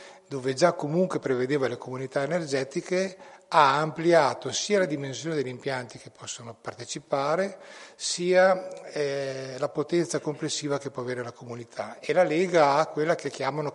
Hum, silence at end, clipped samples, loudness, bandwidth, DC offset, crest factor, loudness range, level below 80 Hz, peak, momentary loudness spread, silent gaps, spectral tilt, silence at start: none; 0 s; under 0.1%; -26 LUFS; 11.5 kHz; under 0.1%; 22 dB; 5 LU; -74 dBFS; -6 dBFS; 16 LU; none; -4.5 dB/octave; 0 s